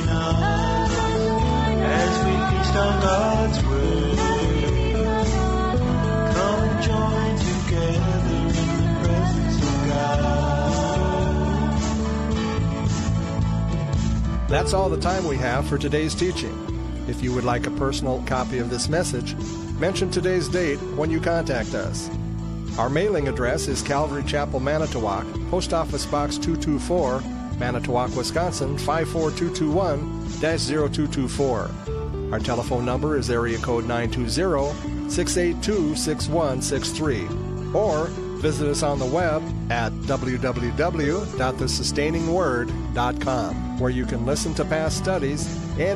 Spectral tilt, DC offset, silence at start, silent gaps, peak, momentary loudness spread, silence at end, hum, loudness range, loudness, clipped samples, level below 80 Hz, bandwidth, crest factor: -5.5 dB/octave; under 0.1%; 0 s; none; -8 dBFS; 5 LU; 0 s; none; 3 LU; -23 LUFS; under 0.1%; -30 dBFS; 13.5 kHz; 14 dB